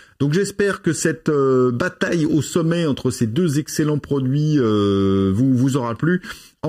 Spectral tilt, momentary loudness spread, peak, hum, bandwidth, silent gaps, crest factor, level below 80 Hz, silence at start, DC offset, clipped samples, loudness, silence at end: -6 dB/octave; 4 LU; -4 dBFS; none; 15.5 kHz; none; 14 dB; -52 dBFS; 0.2 s; under 0.1%; under 0.1%; -19 LUFS; 0 s